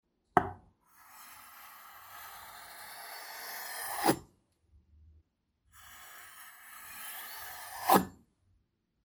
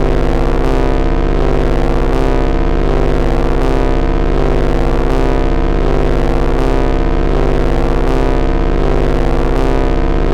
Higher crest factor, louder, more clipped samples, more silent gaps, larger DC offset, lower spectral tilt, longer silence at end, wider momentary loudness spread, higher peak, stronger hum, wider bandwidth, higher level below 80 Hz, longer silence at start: first, 32 dB vs 10 dB; second, -34 LUFS vs -15 LUFS; neither; neither; second, under 0.1% vs 9%; second, -4 dB/octave vs -7.5 dB/octave; first, 0.9 s vs 0 s; first, 22 LU vs 1 LU; second, -6 dBFS vs 0 dBFS; second, none vs 50 Hz at -30 dBFS; first, over 20 kHz vs 7.4 kHz; second, -66 dBFS vs -14 dBFS; first, 0.35 s vs 0 s